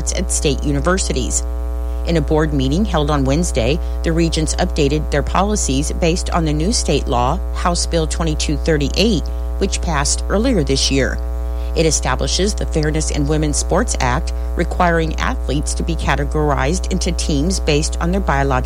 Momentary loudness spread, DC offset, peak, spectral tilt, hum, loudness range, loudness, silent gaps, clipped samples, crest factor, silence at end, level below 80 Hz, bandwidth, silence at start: 5 LU; under 0.1%; -4 dBFS; -4.5 dB/octave; none; 1 LU; -18 LUFS; none; under 0.1%; 14 dB; 0 s; -20 dBFS; 15 kHz; 0 s